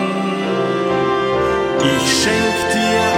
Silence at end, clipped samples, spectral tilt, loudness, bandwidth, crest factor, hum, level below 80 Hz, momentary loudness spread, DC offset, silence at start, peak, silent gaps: 0 s; under 0.1%; -4 dB/octave; -16 LUFS; 16.5 kHz; 14 dB; none; -42 dBFS; 5 LU; under 0.1%; 0 s; -2 dBFS; none